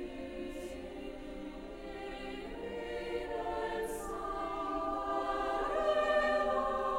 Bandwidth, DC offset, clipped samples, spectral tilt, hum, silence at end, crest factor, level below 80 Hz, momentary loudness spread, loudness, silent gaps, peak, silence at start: 16 kHz; under 0.1%; under 0.1%; -4.5 dB/octave; none; 0 s; 16 dB; -52 dBFS; 15 LU; -36 LUFS; none; -20 dBFS; 0 s